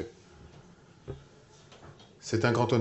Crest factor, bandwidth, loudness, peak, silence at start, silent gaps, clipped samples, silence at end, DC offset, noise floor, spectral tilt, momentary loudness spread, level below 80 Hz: 22 dB; 8.4 kHz; -30 LUFS; -12 dBFS; 0 s; none; under 0.1%; 0 s; under 0.1%; -56 dBFS; -6 dB/octave; 27 LU; -62 dBFS